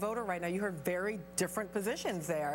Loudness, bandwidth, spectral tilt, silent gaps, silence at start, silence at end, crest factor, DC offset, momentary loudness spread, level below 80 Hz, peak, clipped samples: -36 LUFS; 17 kHz; -4.5 dB/octave; none; 0 s; 0 s; 16 dB; under 0.1%; 1 LU; -64 dBFS; -20 dBFS; under 0.1%